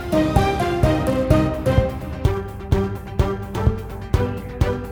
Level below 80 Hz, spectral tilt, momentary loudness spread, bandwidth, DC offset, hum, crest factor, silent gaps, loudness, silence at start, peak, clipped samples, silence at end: -28 dBFS; -7.5 dB/octave; 7 LU; over 20 kHz; under 0.1%; none; 18 dB; none; -21 LUFS; 0 s; -2 dBFS; under 0.1%; 0 s